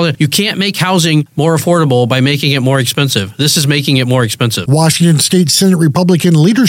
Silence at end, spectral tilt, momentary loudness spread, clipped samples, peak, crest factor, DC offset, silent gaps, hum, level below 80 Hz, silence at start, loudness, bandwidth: 0 s; -4.5 dB/octave; 4 LU; under 0.1%; 0 dBFS; 10 dB; under 0.1%; none; none; -52 dBFS; 0 s; -10 LUFS; 17 kHz